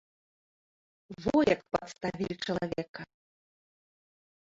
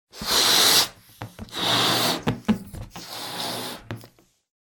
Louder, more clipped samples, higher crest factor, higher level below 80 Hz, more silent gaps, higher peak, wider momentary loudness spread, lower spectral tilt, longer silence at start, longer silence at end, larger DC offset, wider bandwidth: second, -31 LUFS vs -20 LUFS; neither; about the same, 22 dB vs 22 dB; second, -60 dBFS vs -50 dBFS; first, 2.89-2.94 s vs none; second, -12 dBFS vs -4 dBFS; second, 19 LU vs 24 LU; first, -6 dB/octave vs -2 dB/octave; first, 1.1 s vs 0.15 s; first, 1.45 s vs 0.55 s; neither; second, 7.8 kHz vs 19 kHz